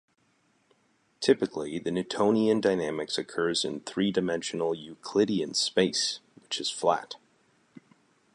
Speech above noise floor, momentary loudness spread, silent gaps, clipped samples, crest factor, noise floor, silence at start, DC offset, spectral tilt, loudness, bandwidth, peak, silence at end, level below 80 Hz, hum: 41 dB; 8 LU; none; under 0.1%; 22 dB; -69 dBFS; 1.2 s; under 0.1%; -4 dB/octave; -28 LUFS; 11.5 kHz; -8 dBFS; 1.2 s; -68 dBFS; none